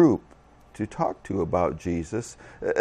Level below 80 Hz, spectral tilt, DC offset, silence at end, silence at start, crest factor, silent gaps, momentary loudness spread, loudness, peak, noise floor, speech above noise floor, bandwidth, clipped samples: -52 dBFS; -7.5 dB/octave; under 0.1%; 0 s; 0 s; 20 dB; none; 9 LU; -28 LUFS; -6 dBFS; -52 dBFS; 27 dB; 10.5 kHz; under 0.1%